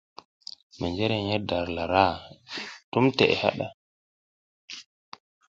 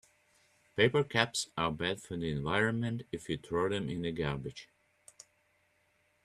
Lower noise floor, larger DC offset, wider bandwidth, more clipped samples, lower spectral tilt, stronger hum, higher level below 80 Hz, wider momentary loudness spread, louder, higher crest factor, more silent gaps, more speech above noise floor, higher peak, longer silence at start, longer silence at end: first, under -90 dBFS vs -73 dBFS; neither; second, 7.8 kHz vs 13 kHz; neither; first, -6 dB/octave vs -4.5 dB/octave; neither; first, -52 dBFS vs -60 dBFS; first, 20 LU vs 11 LU; first, -26 LUFS vs -33 LUFS; about the same, 24 dB vs 28 dB; first, 2.84-2.92 s, 3.74-4.68 s vs none; first, over 65 dB vs 40 dB; first, -4 dBFS vs -8 dBFS; about the same, 0.75 s vs 0.75 s; second, 0.65 s vs 1.6 s